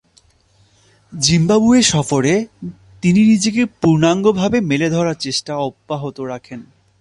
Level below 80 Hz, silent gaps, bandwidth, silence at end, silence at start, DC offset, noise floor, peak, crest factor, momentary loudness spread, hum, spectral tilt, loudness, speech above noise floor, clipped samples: -48 dBFS; none; 11.5 kHz; 0.4 s; 1.1 s; under 0.1%; -55 dBFS; 0 dBFS; 16 dB; 18 LU; none; -5 dB/octave; -15 LUFS; 39 dB; under 0.1%